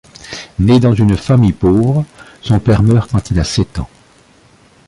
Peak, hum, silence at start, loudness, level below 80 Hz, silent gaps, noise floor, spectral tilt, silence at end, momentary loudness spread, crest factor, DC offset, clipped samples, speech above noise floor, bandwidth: -2 dBFS; none; 0.25 s; -13 LUFS; -30 dBFS; none; -47 dBFS; -7.5 dB/octave; 1 s; 17 LU; 12 dB; under 0.1%; under 0.1%; 35 dB; 11.5 kHz